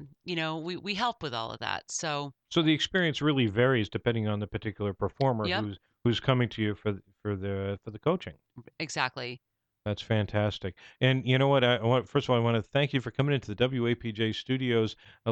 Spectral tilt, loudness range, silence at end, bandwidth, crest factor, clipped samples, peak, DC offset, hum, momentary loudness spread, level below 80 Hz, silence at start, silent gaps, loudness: -5.5 dB/octave; 6 LU; 0 s; 8.8 kHz; 18 dB; under 0.1%; -10 dBFS; under 0.1%; none; 10 LU; -58 dBFS; 0 s; none; -29 LUFS